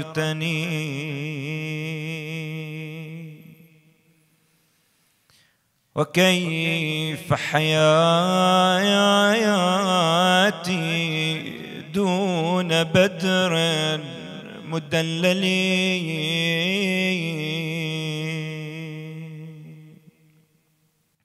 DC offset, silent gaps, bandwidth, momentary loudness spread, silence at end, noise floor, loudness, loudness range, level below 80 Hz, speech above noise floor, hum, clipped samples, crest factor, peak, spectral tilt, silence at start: under 0.1%; none; 14 kHz; 17 LU; 1.35 s; -67 dBFS; -21 LUFS; 14 LU; -66 dBFS; 46 dB; none; under 0.1%; 20 dB; -4 dBFS; -4.5 dB/octave; 0 s